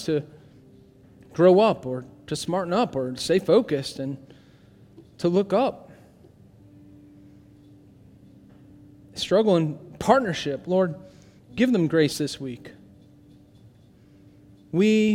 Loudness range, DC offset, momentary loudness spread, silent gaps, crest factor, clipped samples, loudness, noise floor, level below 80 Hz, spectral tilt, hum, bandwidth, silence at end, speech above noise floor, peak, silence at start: 7 LU; under 0.1%; 16 LU; none; 22 dB; under 0.1%; -23 LUFS; -53 dBFS; -60 dBFS; -6 dB/octave; none; 16.5 kHz; 0 s; 31 dB; -4 dBFS; 0 s